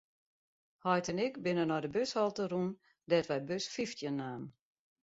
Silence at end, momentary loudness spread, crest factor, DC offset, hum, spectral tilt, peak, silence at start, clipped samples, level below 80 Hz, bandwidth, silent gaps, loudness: 0.55 s; 8 LU; 20 dB; under 0.1%; none; -4.5 dB/octave; -16 dBFS; 0.85 s; under 0.1%; -74 dBFS; 7.6 kHz; none; -35 LUFS